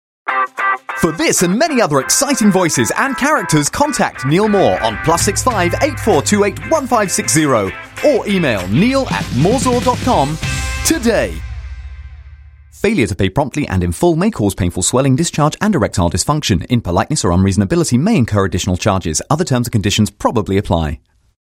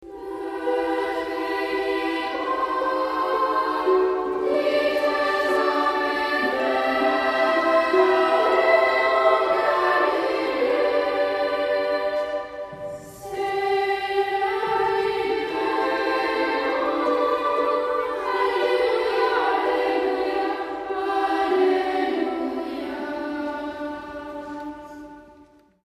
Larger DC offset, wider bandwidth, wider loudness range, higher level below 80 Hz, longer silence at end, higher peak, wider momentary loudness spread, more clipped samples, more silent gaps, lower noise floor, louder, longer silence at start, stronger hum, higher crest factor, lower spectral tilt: neither; first, 16.5 kHz vs 14 kHz; about the same, 4 LU vs 6 LU; first, -32 dBFS vs -58 dBFS; first, 0.55 s vs 0.4 s; first, 0 dBFS vs -6 dBFS; second, 5 LU vs 11 LU; neither; neither; second, -39 dBFS vs -53 dBFS; first, -14 LUFS vs -22 LUFS; first, 0.25 s vs 0 s; neither; about the same, 14 dB vs 16 dB; about the same, -4.5 dB/octave vs -4 dB/octave